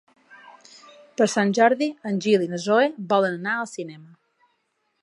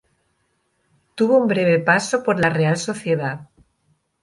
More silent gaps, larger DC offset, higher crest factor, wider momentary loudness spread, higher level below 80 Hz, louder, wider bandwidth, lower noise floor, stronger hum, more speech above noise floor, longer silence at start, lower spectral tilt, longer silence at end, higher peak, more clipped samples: neither; neither; about the same, 20 dB vs 18 dB; first, 14 LU vs 9 LU; second, -78 dBFS vs -60 dBFS; second, -22 LUFS vs -19 LUFS; about the same, 11.5 kHz vs 11.5 kHz; first, -72 dBFS vs -68 dBFS; neither; about the same, 51 dB vs 50 dB; second, 0.45 s vs 1.15 s; about the same, -5 dB/octave vs -5.5 dB/octave; first, 1 s vs 0.8 s; about the same, -4 dBFS vs -2 dBFS; neither